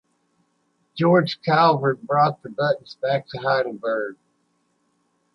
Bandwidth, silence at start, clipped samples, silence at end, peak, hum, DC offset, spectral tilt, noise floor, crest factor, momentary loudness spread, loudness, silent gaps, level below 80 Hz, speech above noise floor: 6.4 kHz; 0.95 s; under 0.1%; 1.2 s; -4 dBFS; none; under 0.1%; -8 dB/octave; -68 dBFS; 18 dB; 8 LU; -21 LUFS; none; -68 dBFS; 48 dB